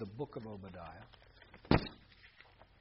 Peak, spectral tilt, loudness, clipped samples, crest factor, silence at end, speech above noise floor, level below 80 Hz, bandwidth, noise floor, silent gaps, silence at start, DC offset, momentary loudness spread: -12 dBFS; -5.5 dB/octave; -38 LUFS; under 0.1%; 28 dB; 0.15 s; 24 dB; -52 dBFS; 5.6 kHz; -62 dBFS; none; 0 s; under 0.1%; 27 LU